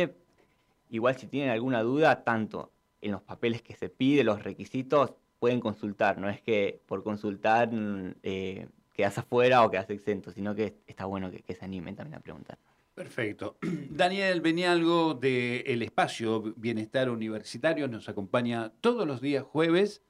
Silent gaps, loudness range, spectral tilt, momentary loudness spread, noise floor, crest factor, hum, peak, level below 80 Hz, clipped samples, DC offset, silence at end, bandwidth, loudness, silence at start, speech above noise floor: none; 5 LU; -6 dB/octave; 14 LU; -68 dBFS; 18 dB; none; -12 dBFS; -70 dBFS; under 0.1%; under 0.1%; 0.15 s; 12.5 kHz; -29 LUFS; 0 s; 39 dB